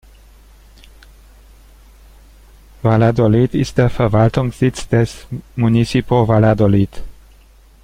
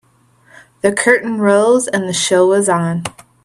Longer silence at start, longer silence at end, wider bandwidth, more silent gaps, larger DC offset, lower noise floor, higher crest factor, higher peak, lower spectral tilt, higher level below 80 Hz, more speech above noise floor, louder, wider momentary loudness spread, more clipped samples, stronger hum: first, 2.85 s vs 0.85 s; first, 0.7 s vs 0.35 s; second, 11 kHz vs 13 kHz; neither; neither; second, -46 dBFS vs -52 dBFS; about the same, 16 dB vs 14 dB; about the same, -2 dBFS vs 0 dBFS; first, -7.5 dB/octave vs -4 dB/octave; first, -36 dBFS vs -58 dBFS; second, 32 dB vs 38 dB; about the same, -15 LUFS vs -14 LUFS; about the same, 8 LU vs 8 LU; neither; neither